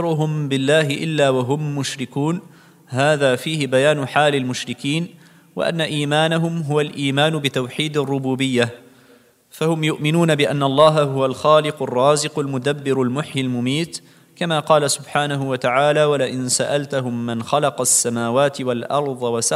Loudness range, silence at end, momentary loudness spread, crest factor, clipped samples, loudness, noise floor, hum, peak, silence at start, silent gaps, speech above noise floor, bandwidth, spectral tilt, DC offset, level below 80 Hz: 3 LU; 0 s; 8 LU; 18 dB; under 0.1%; -19 LUFS; -52 dBFS; none; -2 dBFS; 0 s; none; 33 dB; 15.5 kHz; -4.5 dB/octave; under 0.1%; -66 dBFS